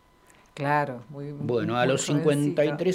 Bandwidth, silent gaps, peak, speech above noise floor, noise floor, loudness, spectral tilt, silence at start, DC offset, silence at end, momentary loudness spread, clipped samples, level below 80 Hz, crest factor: 15.5 kHz; none; -10 dBFS; 32 dB; -57 dBFS; -25 LUFS; -5.5 dB/octave; 0.55 s; under 0.1%; 0 s; 10 LU; under 0.1%; -64 dBFS; 16 dB